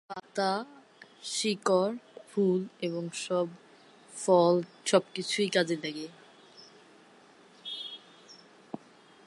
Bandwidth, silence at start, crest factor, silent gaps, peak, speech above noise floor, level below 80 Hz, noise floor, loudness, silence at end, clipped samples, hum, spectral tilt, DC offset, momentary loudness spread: 11.5 kHz; 0.1 s; 22 dB; none; -10 dBFS; 29 dB; -84 dBFS; -58 dBFS; -30 LUFS; 0.5 s; under 0.1%; none; -4.5 dB/octave; under 0.1%; 19 LU